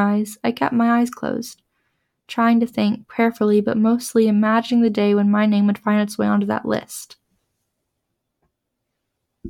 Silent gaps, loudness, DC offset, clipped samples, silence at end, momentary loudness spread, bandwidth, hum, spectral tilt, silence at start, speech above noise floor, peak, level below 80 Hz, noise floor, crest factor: none; -19 LUFS; under 0.1%; under 0.1%; 0 s; 9 LU; 16 kHz; none; -6 dB/octave; 0 s; 59 dB; -4 dBFS; -64 dBFS; -77 dBFS; 14 dB